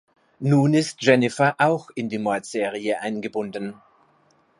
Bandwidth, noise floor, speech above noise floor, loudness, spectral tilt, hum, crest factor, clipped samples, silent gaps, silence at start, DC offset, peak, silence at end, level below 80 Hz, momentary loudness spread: 11.5 kHz; -61 dBFS; 39 dB; -22 LUFS; -6 dB/octave; none; 20 dB; under 0.1%; none; 0.4 s; under 0.1%; -4 dBFS; 0.85 s; -70 dBFS; 11 LU